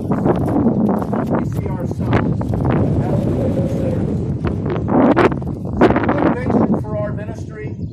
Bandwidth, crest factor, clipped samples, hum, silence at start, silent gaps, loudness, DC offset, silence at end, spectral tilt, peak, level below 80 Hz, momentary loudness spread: 13 kHz; 16 dB; under 0.1%; none; 0 s; none; -18 LUFS; under 0.1%; 0 s; -9 dB/octave; 0 dBFS; -32 dBFS; 9 LU